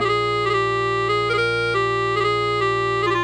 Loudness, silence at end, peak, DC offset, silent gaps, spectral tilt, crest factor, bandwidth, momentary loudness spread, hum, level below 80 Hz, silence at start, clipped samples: -20 LUFS; 0 s; -10 dBFS; under 0.1%; none; -5 dB/octave; 10 dB; 11 kHz; 1 LU; 60 Hz at -80 dBFS; -46 dBFS; 0 s; under 0.1%